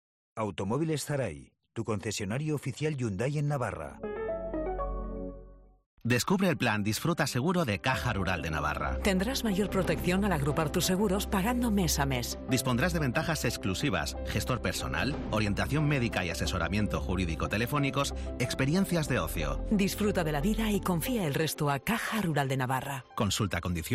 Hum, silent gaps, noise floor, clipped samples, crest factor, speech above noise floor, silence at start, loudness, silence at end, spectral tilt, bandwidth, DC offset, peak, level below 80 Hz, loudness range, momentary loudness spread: none; 5.86-5.97 s; -51 dBFS; under 0.1%; 14 dB; 22 dB; 0.35 s; -30 LUFS; 0 s; -5 dB/octave; 15.5 kHz; under 0.1%; -16 dBFS; -42 dBFS; 5 LU; 7 LU